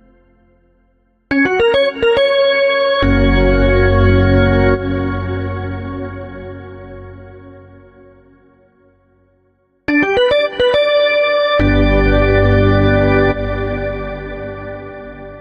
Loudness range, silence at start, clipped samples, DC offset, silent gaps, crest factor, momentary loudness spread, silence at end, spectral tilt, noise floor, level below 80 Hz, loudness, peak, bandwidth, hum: 13 LU; 1.3 s; under 0.1%; under 0.1%; none; 14 dB; 17 LU; 0 s; -8 dB/octave; -58 dBFS; -24 dBFS; -14 LUFS; -2 dBFS; 6.2 kHz; none